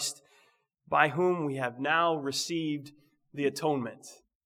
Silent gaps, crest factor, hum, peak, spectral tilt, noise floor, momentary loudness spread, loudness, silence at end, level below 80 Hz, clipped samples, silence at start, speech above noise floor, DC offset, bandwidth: none; 24 dB; none; -8 dBFS; -4 dB/octave; -68 dBFS; 18 LU; -29 LUFS; 0.3 s; -76 dBFS; under 0.1%; 0 s; 38 dB; under 0.1%; 16.5 kHz